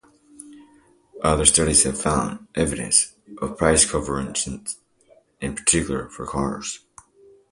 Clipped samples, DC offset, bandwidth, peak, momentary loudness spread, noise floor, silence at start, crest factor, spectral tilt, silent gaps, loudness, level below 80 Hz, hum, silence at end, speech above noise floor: under 0.1%; under 0.1%; 11.5 kHz; 0 dBFS; 16 LU; -57 dBFS; 0.4 s; 24 dB; -3 dB/octave; none; -20 LUFS; -40 dBFS; none; 0.75 s; 35 dB